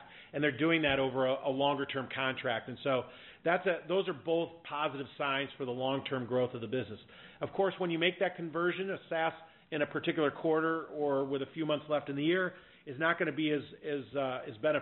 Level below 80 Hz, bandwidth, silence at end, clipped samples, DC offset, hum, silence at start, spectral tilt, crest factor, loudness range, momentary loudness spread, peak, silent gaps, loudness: -70 dBFS; 4.2 kHz; 0 s; under 0.1%; under 0.1%; none; 0 s; -3.5 dB/octave; 20 dB; 2 LU; 8 LU; -14 dBFS; none; -33 LUFS